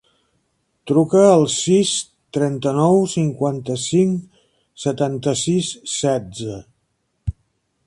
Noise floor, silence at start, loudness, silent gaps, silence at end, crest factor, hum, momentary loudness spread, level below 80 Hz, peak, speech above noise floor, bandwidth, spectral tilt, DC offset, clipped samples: -69 dBFS; 0.85 s; -18 LUFS; none; 0.55 s; 20 dB; none; 17 LU; -46 dBFS; 0 dBFS; 52 dB; 11.5 kHz; -5.5 dB/octave; under 0.1%; under 0.1%